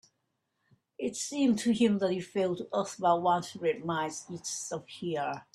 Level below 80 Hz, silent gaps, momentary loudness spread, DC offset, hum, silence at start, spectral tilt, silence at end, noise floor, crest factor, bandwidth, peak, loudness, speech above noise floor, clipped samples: -72 dBFS; none; 10 LU; under 0.1%; none; 1 s; -4.5 dB/octave; 0.1 s; -80 dBFS; 18 dB; 13 kHz; -12 dBFS; -31 LUFS; 50 dB; under 0.1%